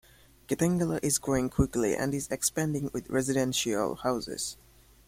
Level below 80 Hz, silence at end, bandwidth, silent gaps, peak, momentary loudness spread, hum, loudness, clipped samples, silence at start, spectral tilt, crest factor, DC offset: -48 dBFS; 0.55 s; 16.5 kHz; none; -12 dBFS; 6 LU; none; -29 LUFS; under 0.1%; 0.5 s; -4.5 dB/octave; 18 dB; under 0.1%